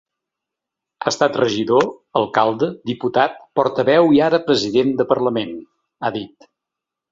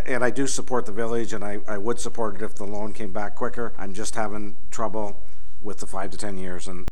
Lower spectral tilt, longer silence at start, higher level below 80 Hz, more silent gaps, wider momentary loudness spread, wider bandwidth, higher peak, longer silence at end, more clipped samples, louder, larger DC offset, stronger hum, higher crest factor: about the same, -5 dB/octave vs -4.5 dB/octave; first, 1 s vs 0 s; second, -60 dBFS vs -48 dBFS; neither; about the same, 11 LU vs 10 LU; second, 7.8 kHz vs 15 kHz; first, 0 dBFS vs -4 dBFS; first, 0.85 s vs 0 s; neither; first, -18 LUFS vs -30 LUFS; second, under 0.1% vs 20%; neither; about the same, 18 dB vs 22 dB